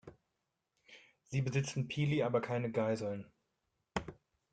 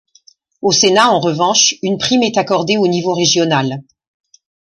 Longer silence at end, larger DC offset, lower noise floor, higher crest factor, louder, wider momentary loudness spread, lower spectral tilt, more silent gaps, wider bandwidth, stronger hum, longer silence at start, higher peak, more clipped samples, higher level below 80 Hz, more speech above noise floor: second, 0.4 s vs 0.9 s; neither; first, -86 dBFS vs -50 dBFS; first, 20 dB vs 14 dB; second, -37 LUFS vs -13 LUFS; first, 10 LU vs 7 LU; first, -6.5 dB/octave vs -3 dB/octave; neither; second, 9.2 kHz vs 11.5 kHz; neither; second, 0.05 s vs 0.65 s; second, -20 dBFS vs 0 dBFS; neither; second, -66 dBFS vs -58 dBFS; first, 51 dB vs 37 dB